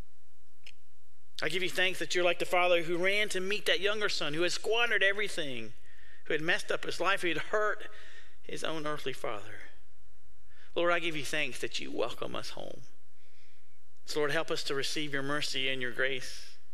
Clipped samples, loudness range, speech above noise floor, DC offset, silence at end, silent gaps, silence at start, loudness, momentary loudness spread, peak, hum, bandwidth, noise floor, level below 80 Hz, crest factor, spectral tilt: under 0.1%; 8 LU; 37 dB; 3%; 0.2 s; none; 1.4 s; -31 LUFS; 15 LU; -12 dBFS; none; 15.5 kHz; -70 dBFS; -64 dBFS; 20 dB; -3 dB/octave